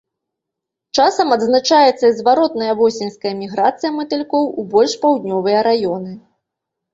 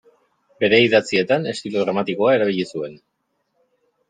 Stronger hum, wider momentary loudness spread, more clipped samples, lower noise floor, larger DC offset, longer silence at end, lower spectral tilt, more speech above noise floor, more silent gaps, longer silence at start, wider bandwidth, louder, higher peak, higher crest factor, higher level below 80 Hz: neither; about the same, 10 LU vs 11 LU; neither; first, -82 dBFS vs -71 dBFS; neither; second, 0.75 s vs 1.15 s; about the same, -4 dB/octave vs -5 dB/octave; first, 66 dB vs 53 dB; neither; first, 0.95 s vs 0.6 s; second, 7.8 kHz vs 9.4 kHz; first, -16 LUFS vs -19 LUFS; about the same, -2 dBFS vs -2 dBFS; about the same, 16 dB vs 20 dB; about the same, -62 dBFS vs -64 dBFS